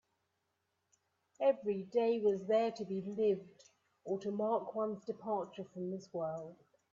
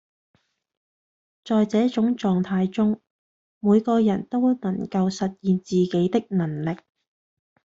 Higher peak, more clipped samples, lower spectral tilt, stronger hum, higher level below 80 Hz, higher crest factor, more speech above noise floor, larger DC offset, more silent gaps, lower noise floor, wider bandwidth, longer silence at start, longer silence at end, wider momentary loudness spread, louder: second, -20 dBFS vs -8 dBFS; neither; about the same, -7 dB/octave vs -7.5 dB/octave; neither; second, -82 dBFS vs -62 dBFS; about the same, 18 dB vs 16 dB; second, 48 dB vs over 68 dB; neither; second, none vs 3.10-3.61 s; second, -84 dBFS vs under -90 dBFS; about the same, 7.4 kHz vs 7.6 kHz; about the same, 1.4 s vs 1.45 s; second, 0.4 s vs 1 s; first, 10 LU vs 7 LU; second, -37 LUFS vs -23 LUFS